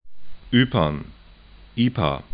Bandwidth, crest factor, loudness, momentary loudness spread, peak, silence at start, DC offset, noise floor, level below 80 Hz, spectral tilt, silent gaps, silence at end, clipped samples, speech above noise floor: 5 kHz; 20 dB; -22 LUFS; 15 LU; -4 dBFS; 0 s; under 0.1%; -47 dBFS; -42 dBFS; -11 dB/octave; none; 0 s; under 0.1%; 26 dB